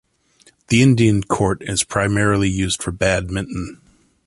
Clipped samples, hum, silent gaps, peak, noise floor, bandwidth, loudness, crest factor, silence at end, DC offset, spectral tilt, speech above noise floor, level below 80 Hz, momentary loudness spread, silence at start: under 0.1%; none; none; -2 dBFS; -55 dBFS; 11.5 kHz; -18 LUFS; 16 dB; 0.55 s; under 0.1%; -5 dB/octave; 37 dB; -38 dBFS; 11 LU; 0.7 s